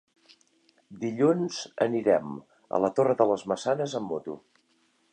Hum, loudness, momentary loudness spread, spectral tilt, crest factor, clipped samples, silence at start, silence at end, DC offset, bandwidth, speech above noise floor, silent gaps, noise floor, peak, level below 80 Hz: none; -27 LUFS; 14 LU; -6 dB/octave; 20 dB; under 0.1%; 0.9 s; 0.75 s; under 0.1%; 9.6 kHz; 42 dB; none; -68 dBFS; -8 dBFS; -72 dBFS